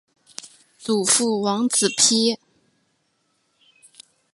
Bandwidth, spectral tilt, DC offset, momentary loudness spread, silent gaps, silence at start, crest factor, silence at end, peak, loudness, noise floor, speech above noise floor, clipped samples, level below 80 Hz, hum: 11.5 kHz; -2 dB/octave; under 0.1%; 23 LU; none; 0.45 s; 22 dB; 2 s; -2 dBFS; -18 LUFS; -69 dBFS; 49 dB; under 0.1%; -72 dBFS; none